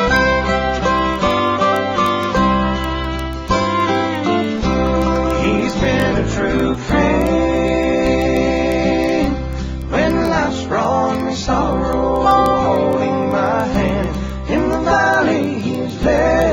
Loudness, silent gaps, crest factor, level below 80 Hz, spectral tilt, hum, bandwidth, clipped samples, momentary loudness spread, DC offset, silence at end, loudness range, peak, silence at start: -16 LUFS; none; 16 dB; -28 dBFS; -6 dB/octave; none; 16 kHz; under 0.1%; 6 LU; under 0.1%; 0 s; 1 LU; 0 dBFS; 0 s